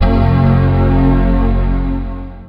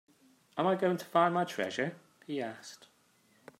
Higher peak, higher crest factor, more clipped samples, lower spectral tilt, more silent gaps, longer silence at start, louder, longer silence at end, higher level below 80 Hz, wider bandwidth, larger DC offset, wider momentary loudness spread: first, 0 dBFS vs -12 dBFS; second, 10 dB vs 22 dB; neither; first, -10.5 dB/octave vs -5.5 dB/octave; neither; second, 0 s vs 0.55 s; first, -13 LUFS vs -32 LUFS; second, 0 s vs 0.85 s; first, -16 dBFS vs -82 dBFS; second, 5.2 kHz vs 16 kHz; neither; second, 9 LU vs 18 LU